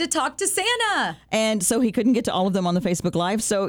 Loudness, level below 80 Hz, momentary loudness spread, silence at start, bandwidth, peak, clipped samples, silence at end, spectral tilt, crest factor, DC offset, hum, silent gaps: -22 LUFS; -54 dBFS; 3 LU; 0 s; over 20 kHz; -8 dBFS; under 0.1%; 0 s; -3.5 dB/octave; 14 dB; under 0.1%; none; none